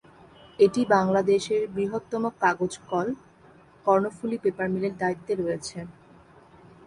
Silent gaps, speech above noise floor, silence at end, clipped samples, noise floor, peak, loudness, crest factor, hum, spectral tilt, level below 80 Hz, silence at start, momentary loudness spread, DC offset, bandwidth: none; 29 dB; 0.95 s; under 0.1%; -54 dBFS; -6 dBFS; -25 LUFS; 20 dB; none; -6 dB/octave; -62 dBFS; 0.6 s; 11 LU; under 0.1%; 11.5 kHz